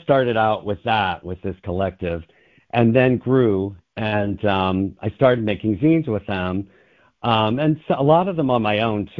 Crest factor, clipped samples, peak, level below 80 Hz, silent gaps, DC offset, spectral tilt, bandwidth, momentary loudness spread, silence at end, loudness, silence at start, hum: 18 dB; under 0.1%; -2 dBFS; -44 dBFS; none; under 0.1%; -9.5 dB/octave; 5.4 kHz; 11 LU; 0.1 s; -20 LUFS; 0.1 s; none